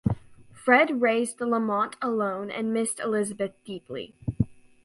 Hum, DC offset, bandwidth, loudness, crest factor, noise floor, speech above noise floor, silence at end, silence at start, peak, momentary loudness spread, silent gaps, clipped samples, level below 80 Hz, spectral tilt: none; under 0.1%; 11.5 kHz; -26 LUFS; 20 dB; -49 dBFS; 23 dB; 0.3 s; 0.05 s; -6 dBFS; 15 LU; none; under 0.1%; -50 dBFS; -5.5 dB/octave